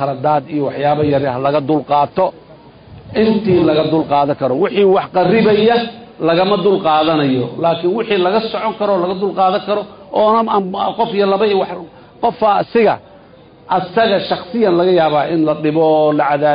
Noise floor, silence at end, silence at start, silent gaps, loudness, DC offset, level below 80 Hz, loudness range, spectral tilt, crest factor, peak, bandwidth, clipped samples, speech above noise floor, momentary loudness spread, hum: -42 dBFS; 0 s; 0 s; none; -14 LUFS; under 0.1%; -50 dBFS; 3 LU; -12 dB/octave; 12 dB; -2 dBFS; 5.2 kHz; under 0.1%; 28 dB; 7 LU; none